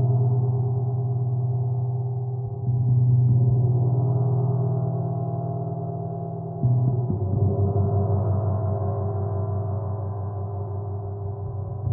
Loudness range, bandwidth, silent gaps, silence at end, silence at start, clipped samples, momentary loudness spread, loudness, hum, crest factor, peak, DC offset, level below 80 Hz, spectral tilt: 4 LU; 1.6 kHz; none; 0 s; 0 s; under 0.1%; 10 LU; -25 LUFS; none; 12 dB; -12 dBFS; under 0.1%; -50 dBFS; -16.5 dB/octave